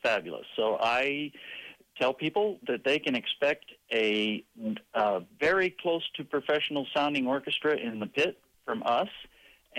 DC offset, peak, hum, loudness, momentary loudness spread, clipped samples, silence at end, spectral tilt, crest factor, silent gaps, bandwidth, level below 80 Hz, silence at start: under 0.1%; -18 dBFS; none; -29 LUFS; 11 LU; under 0.1%; 0 s; -4.5 dB/octave; 12 dB; none; 15.5 kHz; -70 dBFS; 0.05 s